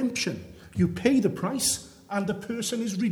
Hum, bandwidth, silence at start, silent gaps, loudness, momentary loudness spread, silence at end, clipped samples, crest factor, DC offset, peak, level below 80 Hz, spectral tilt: none; 19 kHz; 0 s; none; -27 LUFS; 9 LU; 0 s; under 0.1%; 20 dB; under 0.1%; -8 dBFS; -54 dBFS; -4.5 dB/octave